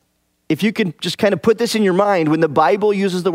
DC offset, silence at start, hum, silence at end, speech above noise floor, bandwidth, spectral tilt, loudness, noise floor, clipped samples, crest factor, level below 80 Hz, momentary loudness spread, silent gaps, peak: under 0.1%; 0.5 s; none; 0 s; 50 dB; 16 kHz; -5.5 dB/octave; -16 LUFS; -65 dBFS; under 0.1%; 16 dB; -60 dBFS; 5 LU; none; 0 dBFS